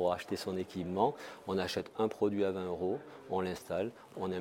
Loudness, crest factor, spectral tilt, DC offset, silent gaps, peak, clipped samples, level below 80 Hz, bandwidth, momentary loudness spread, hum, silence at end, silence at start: -36 LUFS; 18 dB; -6 dB/octave; under 0.1%; none; -16 dBFS; under 0.1%; -68 dBFS; 16.5 kHz; 7 LU; none; 0 s; 0 s